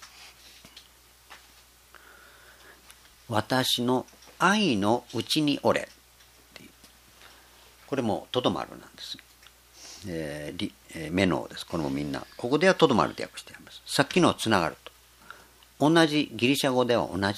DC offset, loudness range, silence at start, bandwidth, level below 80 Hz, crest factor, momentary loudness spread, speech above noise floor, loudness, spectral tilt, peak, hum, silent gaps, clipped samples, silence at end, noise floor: under 0.1%; 8 LU; 0 s; 15.5 kHz; -60 dBFS; 26 dB; 20 LU; 30 dB; -26 LUFS; -4.5 dB/octave; -4 dBFS; none; none; under 0.1%; 0 s; -56 dBFS